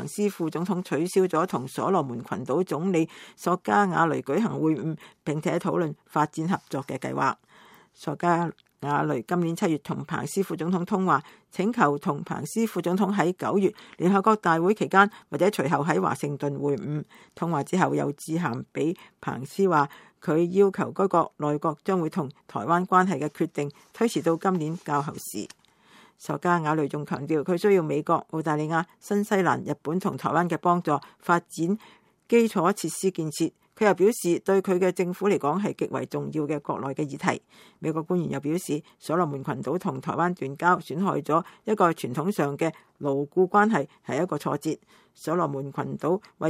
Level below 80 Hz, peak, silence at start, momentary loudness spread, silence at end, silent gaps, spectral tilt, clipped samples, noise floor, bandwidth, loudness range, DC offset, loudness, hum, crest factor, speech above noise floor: -72 dBFS; -4 dBFS; 0 s; 10 LU; 0 s; none; -6.5 dB/octave; under 0.1%; -56 dBFS; 16 kHz; 4 LU; under 0.1%; -26 LUFS; none; 22 dB; 31 dB